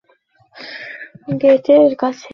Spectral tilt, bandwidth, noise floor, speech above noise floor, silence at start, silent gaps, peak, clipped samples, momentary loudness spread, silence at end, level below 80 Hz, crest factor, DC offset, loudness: -7 dB/octave; 6.4 kHz; -57 dBFS; 44 dB; 0.6 s; none; -2 dBFS; under 0.1%; 21 LU; 0.05 s; -62 dBFS; 14 dB; under 0.1%; -14 LUFS